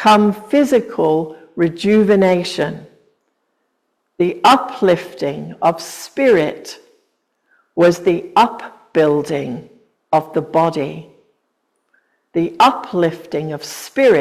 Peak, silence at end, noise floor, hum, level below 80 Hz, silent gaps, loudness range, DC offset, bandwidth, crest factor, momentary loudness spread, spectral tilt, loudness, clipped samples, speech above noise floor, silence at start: 0 dBFS; 0 s; -69 dBFS; none; -58 dBFS; none; 3 LU; under 0.1%; 16 kHz; 16 dB; 14 LU; -5.5 dB/octave; -16 LUFS; under 0.1%; 54 dB; 0 s